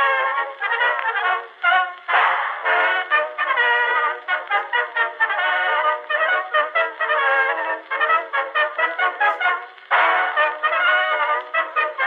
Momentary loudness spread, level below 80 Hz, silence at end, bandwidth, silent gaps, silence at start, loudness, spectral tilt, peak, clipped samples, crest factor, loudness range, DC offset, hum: 5 LU; -86 dBFS; 0 s; 7.2 kHz; none; 0 s; -19 LUFS; 0 dB/octave; -4 dBFS; under 0.1%; 16 dB; 1 LU; under 0.1%; none